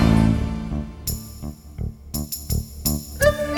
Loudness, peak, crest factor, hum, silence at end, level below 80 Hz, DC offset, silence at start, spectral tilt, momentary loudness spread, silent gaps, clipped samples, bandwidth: -24 LUFS; -4 dBFS; 20 dB; none; 0 s; -30 dBFS; under 0.1%; 0 s; -5.5 dB/octave; 14 LU; none; under 0.1%; over 20 kHz